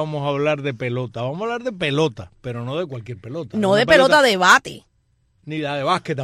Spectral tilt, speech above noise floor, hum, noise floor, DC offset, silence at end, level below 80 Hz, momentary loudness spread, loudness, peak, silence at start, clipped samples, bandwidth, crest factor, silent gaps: -4.5 dB/octave; 44 dB; none; -63 dBFS; under 0.1%; 0 s; -54 dBFS; 18 LU; -18 LUFS; -2 dBFS; 0 s; under 0.1%; 14 kHz; 18 dB; none